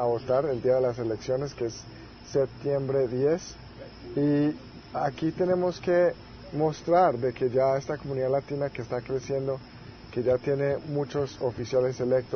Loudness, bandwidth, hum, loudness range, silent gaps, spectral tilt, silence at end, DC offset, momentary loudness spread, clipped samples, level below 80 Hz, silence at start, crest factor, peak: -28 LUFS; 6.6 kHz; none; 4 LU; none; -7 dB/octave; 0 s; under 0.1%; 13 LU; under 0.1%; -56 dBFS; 0 s; 18 dB; -10 dBFS